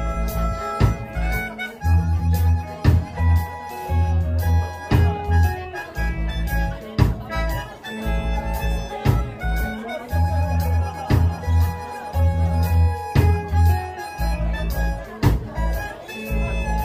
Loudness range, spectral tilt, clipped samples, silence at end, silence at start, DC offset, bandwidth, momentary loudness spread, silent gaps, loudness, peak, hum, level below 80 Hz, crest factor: 4 LU; -7 dB/octave; under 0.1%; 0 s; 0 s; under 0.1%; 16 kHz; 8 LU; none; -22 LUFS; -2 dBFS; none; -26 dBFS; 18 dB